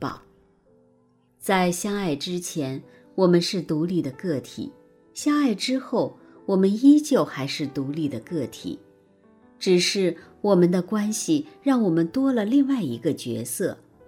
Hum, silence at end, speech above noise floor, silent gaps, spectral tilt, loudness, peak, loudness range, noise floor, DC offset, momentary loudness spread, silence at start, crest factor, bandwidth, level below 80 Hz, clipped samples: none; 0.3 s; 39 dB; none; -5.5 dB/octave; -23 LUFS; -6 dBFS; 4 LU; -62 dBFS; under 0.1%; 14 LU; 0 s; 18 dB; 16.5 kHz; -64 dBFS; under 0.1%